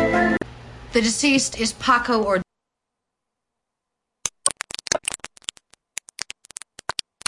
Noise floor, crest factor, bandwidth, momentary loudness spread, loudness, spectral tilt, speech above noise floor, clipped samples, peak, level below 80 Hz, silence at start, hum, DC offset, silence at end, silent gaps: -82 dBFS; 20 dB; 11.5 kHz; 17 LU; -22 LUFS; -2.5 dB/octave; 63 dB; under 0.1%; -4 dBFS; -48 dBFS; 0 s; none; under 0.1%; 2.15 s; none